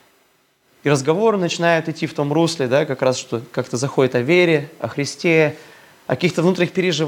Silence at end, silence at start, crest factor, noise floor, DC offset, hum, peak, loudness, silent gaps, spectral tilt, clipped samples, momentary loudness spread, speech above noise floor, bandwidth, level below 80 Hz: 0 s; 0.85 s; 18 dB; -60 dBFS; under 0.1%; none; 0 dBFS; -19 LUFS; none; -5.5 dB/octave; under 0.1%; 9 LU; 42 dB; 17 kHz; -68 dBFS